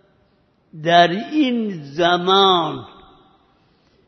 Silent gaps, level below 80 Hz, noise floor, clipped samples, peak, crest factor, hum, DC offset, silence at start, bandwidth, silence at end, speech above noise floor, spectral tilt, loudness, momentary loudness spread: none; -62 dBFS; -60 dBFS; under 0.1%; -2 dBFS; 18 dB; none; under 0.1%; 0.75 s; 6.6 kHz; 1.2 s; 43 dB; -5.5 dB/octave; -17 LUFS; 13 LU